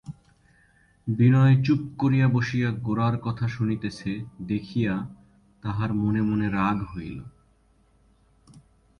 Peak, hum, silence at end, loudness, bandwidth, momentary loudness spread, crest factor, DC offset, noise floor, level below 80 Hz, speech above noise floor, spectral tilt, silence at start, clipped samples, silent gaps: -10 dBFS; none; 0.4 s; -25 LUFS; 6.8 kHz; 16 LU; 16 dB; under 0.1%; -62 dBFS; -52 dBFS; 38 dB; -8.5 dB/octave; 0.05 s; under 0.1%; none